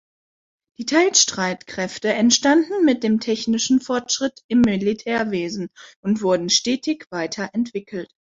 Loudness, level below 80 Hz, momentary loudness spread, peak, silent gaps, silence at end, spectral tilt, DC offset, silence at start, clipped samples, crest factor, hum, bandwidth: -20 LUFS; -56 dBFS; 12 LU; -2 dBFS; 4.44-4.49 s, 5.96-6.03 s; 0.25 s; -3 dB/octave; under 0.1%; 0.8 s; under 0.1%; 20 dB; none; 7.8 kHz